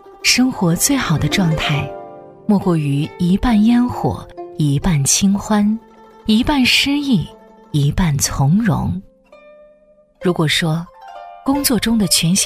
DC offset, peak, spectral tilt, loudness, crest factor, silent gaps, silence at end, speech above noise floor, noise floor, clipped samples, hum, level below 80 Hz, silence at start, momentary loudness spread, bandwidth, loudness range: under 0.1%; 0 dBFS; -4 dB/octave; -16 LUFS; 16 dB; none; 0 s; 36 dB; -51 dBFS; under 0.1%; none; -34 dBFS; 0.05 s; 14 LU; 16 kHz; 4 LU